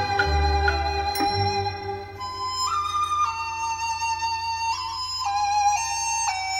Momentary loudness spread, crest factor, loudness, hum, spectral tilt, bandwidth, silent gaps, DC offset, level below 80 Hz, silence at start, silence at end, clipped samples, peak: 7 LU; 16 dB; -24 LUFS; none; -2.5 dB/octave; 16 kHz; none; under 0.1%; -36 dBFS; 0 s; 0 s; under 0.1%; -8 dBFS